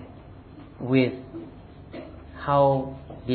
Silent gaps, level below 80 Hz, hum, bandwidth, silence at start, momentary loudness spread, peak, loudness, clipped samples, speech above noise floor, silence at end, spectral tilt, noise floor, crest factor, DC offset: none; -50 dBFS; none; 4.6 kHz; 0 s; 25 LU; -8 dBFS; -24 LUFS; under 0.1%; 22 dB; 0 s; -11 dB/octave; -45 dBFS; 20 dB; under 0.1%